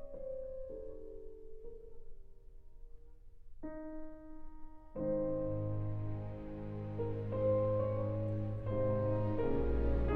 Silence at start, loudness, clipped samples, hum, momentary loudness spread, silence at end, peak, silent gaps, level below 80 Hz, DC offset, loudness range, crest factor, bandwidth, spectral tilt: 0 s; -38 LUFS; under 0.1%; none; 20 LU; 0 s; -22 dBFS; none; -46 dBFS; under 0.1%; 17 LU; 14 dB; 4.3 kHz; -11 dB/octave